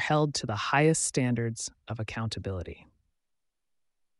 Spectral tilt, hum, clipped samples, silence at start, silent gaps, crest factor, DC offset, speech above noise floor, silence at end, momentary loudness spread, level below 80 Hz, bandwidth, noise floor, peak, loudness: -4.5 dB/octave; none; under 0.1%; 0 s; none; 20 dB; under 0.1%; 52 dB; 1.45 s; 13 LU; -56 dBFS; 11.5 kHz; -81 dBFS; -10 dBFS; -29 LUFS